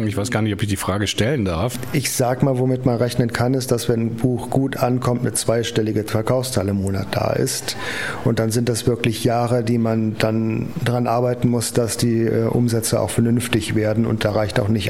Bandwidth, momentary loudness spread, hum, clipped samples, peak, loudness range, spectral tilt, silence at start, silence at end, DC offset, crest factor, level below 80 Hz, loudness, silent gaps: 16.5 kHz; 3 LU; none; under 0.1%; -2 dBFS; 2 LU; -5.5 dB/octave; 0 s; 0 s; 0.7%; 18 dB; -46 dBFS; -20 LUFS; none